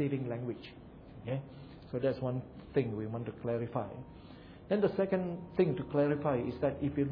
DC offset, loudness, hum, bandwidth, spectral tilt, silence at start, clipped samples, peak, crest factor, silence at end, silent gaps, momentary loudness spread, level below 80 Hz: under 0.1%; -35 LUFS; none; 5.2 kHz; -7.5 dB/octave; 0 s; under 0.1%; -16 dBFS; 18 dB; 0 s; none; 20 LU; -60 dBFS